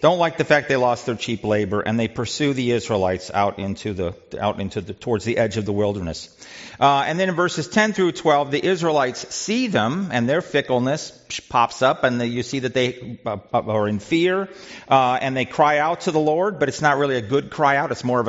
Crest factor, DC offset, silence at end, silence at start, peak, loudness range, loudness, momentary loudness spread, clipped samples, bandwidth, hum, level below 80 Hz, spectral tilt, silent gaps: 18 dB; under 0.1%; 0 s; 0 s; -2 dBFS; 4 LU; -21 LUFS; 10 LU; under 0.1%; 8 kHz; none; -56 dBFS; -4 dB/octave; none